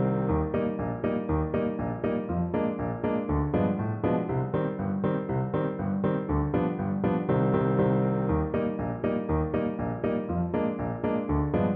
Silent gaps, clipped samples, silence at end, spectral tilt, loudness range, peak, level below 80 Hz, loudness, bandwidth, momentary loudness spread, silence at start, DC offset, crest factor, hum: none; under 0.1%; 0 s; -12 dB/octave; 2 LU; -12 dBFS; -42 dBFS; -28 LUFS; 3.8 kHz; 5 LU; 0 s; under 0.1%; 14 dB; none